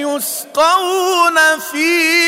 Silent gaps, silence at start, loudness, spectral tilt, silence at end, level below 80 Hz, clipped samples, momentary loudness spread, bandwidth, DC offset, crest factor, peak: none; 0 s; -13 LUFS; 0 dB/octave; 0 s; -62 dBFS; under 0.1%; 8 LU; 16.5 kHz; under 0.1%; 12 dB; -2 dBFS